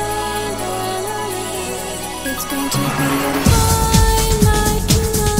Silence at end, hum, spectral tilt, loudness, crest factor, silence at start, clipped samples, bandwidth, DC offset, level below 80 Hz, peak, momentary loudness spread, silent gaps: 0 s; none; -4 dB/octave; -17 LUFS; 16 dB; 0 s; under 0.1%; 16.5 kHz; 0.7%; -24 dBFS; 0 dBFS; 9 LU; none